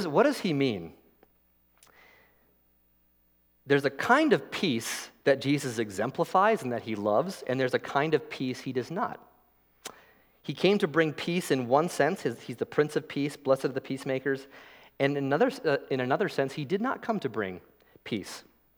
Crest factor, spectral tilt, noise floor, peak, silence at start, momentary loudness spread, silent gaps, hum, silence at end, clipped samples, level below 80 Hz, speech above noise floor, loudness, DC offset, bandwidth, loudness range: 22 dB; -5.5 dB/octave; -67 dBFS; -8 dBFS; 0 s; 12 LU; none; 60 Hz at -60 dBFS; 0.35 s; under 0.1%; -74 dBFS; 39 dB; -28 LUFS; under 0.1%; 19.5 kHz; 4 LU